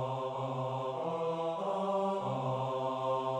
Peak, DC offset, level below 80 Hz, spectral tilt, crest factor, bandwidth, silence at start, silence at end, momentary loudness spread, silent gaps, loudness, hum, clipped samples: -22 dBFS; under 0.1%; -74 dBFS; -7.5 dB/octave; 12 dB; 9.8 kHz; 0 s; 0 s; 3 LU; none; -35 LUFS; none; under 0.1%